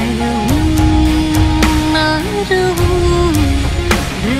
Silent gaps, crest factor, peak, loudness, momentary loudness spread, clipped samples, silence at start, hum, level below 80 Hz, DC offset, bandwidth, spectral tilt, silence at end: none; 12 dB; 0 dBFS; -13 LUFS; 3 LU; under 0.1%; 0 s; none; -18 dBFS; under 0.1%; 16 kHz; -5.5 dB/octave; 0 s